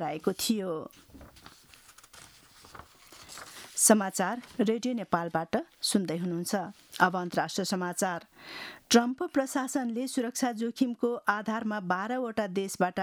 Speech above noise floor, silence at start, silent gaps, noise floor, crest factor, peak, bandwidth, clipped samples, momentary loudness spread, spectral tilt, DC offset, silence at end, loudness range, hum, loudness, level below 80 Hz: 26 dB; 0 s; none; -56 dBFS; 22 dB; -8 dBFS; 20 kHz; under 0.1%; 17 LU; -3.5 dB/octave; under 0.1%; 0 s; 3 LU; none; -29 LUFS; -68 dBFS